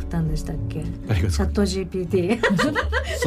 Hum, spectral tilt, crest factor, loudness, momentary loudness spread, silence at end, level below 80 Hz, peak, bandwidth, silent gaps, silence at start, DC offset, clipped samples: none; -6 dB/octave; 14 dB; -23 LUFS; 9 LU; 0 s; -30 dBFS; -10 dBFS; 15.5 kHz; none; 0 s; under 0.1%; under 0.1%